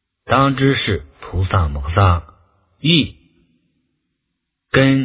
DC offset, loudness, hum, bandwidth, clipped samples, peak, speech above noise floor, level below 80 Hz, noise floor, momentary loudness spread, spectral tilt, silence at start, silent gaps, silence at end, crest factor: under 0.1%; -17 LUFS; none; 4 kHz; under 0.1%; 0 dBFS; 61 dB; -30 dBFS; -76 dBFS; 9 LU; -10.5 dB/octave; 0.25 s; none; 0 s; 18 dB